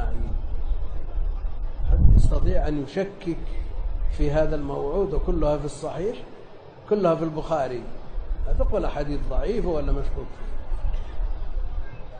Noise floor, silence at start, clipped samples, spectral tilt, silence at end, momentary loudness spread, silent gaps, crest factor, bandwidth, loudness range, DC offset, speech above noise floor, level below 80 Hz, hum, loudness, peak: -42 dBFS; 0 s; under 0.1%; -8 dB/octave; 0 s; 14 LU; none; 20 dB; 9.2 kHz; 4 LU; under 0.1%; 19 dB; -24 dBFS; none; -27 LUFS; -2 dBFS